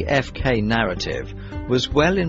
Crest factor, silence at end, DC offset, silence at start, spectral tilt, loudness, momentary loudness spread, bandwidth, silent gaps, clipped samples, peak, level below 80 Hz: 18 dB; 0 s; under 0.1%; 0 s; -5.5 dB/octave; -21 LUFS; 12 LU; 8 kHz; none; under 0.1%; -4 dBFS; -34 dBFS